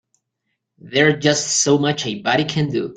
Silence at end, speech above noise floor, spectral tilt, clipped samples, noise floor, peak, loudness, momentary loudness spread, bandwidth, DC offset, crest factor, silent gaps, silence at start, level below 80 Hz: 0 s; 57 dB; -3.5 dB/octave; under 0.1%; -75 dBFS; -2 dBFS; -17 LUFS; 6 LU; 9.6 kHz; under 0.1%; 18 dB; none; 0.85 s; -58 dBFS